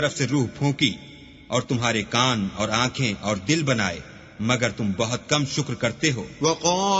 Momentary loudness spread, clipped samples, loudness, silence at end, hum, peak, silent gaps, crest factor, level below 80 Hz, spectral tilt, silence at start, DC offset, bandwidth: 6 LU; under 0.1%; -23 LUFS; 0 s; none; -2 dBFS; none; 20 dB; -52 dBFS; -4 dB/octave; 0 s; under 0.1%; 8 kHz